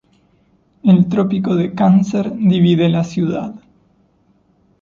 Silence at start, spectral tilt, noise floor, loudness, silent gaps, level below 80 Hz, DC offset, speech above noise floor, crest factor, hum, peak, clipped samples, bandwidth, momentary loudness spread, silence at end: 0.85 s; -8.5 dB/octave; -57 dBFS; -15 LUFS; none; -54 dBFS; under 0.1%; 43 dB; 14 dB; none; -2 dBFS; under 0.1%; 7.2 kHz; 7 LU; 1.25 s